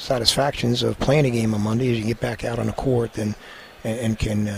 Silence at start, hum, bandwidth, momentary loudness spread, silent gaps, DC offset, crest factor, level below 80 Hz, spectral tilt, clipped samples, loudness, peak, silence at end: 0 s; none; 15.5 kHz; 10 LU; none; under 0.1%; 22 dB; -40 dBFS; -5.5 dB/octave; under 0.1%; -22 LUFS; 0 dBFS; 0 s